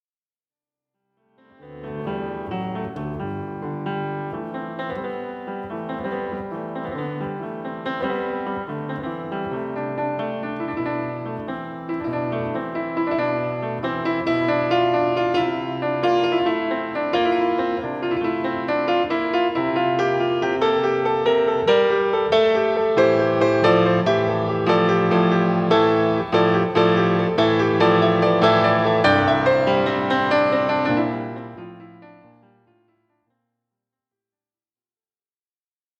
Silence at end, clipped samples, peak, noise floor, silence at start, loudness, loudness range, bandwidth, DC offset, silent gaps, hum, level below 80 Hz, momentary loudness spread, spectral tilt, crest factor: 3.9 s; under 0.1%; -2 dBFS; under -90 dBFS; 1.65 s; -21 LUFS; 12 LU; 7.8 kHz; under 0.1%; none; none; -56 dBFS; 13 LU; -7 dB/octave; 20 dB